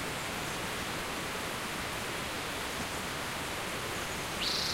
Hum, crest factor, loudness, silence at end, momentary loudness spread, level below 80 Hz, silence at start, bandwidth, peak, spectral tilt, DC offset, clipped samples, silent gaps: none; 16 dB; -35 LUFS; 0 s; 2 LU; -54 dBFS; 0 s; 16 kHz; -20 dBFS; -2.5 dB/octave; under 0.1%; under 0.1%; none